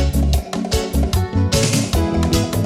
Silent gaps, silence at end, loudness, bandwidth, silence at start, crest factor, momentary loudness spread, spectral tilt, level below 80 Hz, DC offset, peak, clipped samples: none; 0 s; -18 LUFS; 16.5 kHz; 0 s; 12 dB; 4 LU; -5 dB/octave; -22 dBFS; under 0.1%; -4 dBFS; under 0.1%